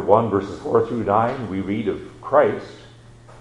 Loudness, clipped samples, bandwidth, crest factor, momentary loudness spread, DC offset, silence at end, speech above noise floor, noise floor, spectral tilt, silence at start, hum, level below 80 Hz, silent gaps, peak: -21 LUFS; under 0.1%; 10.5 kHz; 20 dB; 11 LU; under 0.1%; 0 s; 25 dB; -45 dBFS; -8 dB/octave; 0 s; none; -52 dBFS; none; 0 dBFS